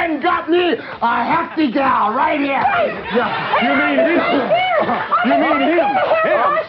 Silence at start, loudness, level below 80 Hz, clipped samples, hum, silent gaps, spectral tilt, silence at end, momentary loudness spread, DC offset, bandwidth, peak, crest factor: 0 s; -16 LUFS; -54 dBFS; under 0.1%; none; none; -7.5 dB/octave; 0 s; 4 LU; under 0.1%; 5.8 kHz; -4 dBFS; 12 dB